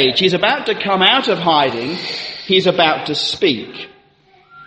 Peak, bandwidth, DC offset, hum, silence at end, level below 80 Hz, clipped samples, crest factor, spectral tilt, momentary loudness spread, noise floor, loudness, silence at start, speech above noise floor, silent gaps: 0 dBFS; 8.8 kHz; under 0.1%; none; 0 s; -58 dBFS; under 0.1%; 16 dB; -4.5 dB/octave; 12 LU; -52 dBFS; -15 LUFS; 0 s; 36 dB; none